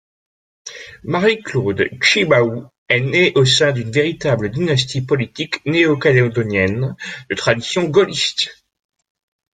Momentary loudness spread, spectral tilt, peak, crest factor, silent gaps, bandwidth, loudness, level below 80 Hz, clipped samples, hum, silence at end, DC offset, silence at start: 11 LU; -5 dB/octave; 0 dBFS; 18 dB; 2.78-2.86 s; 9.4 kHz; -16 LUFS; -52 dBFS; under 0.1%; none; 1.05 s; under 0.1%; 0.65 s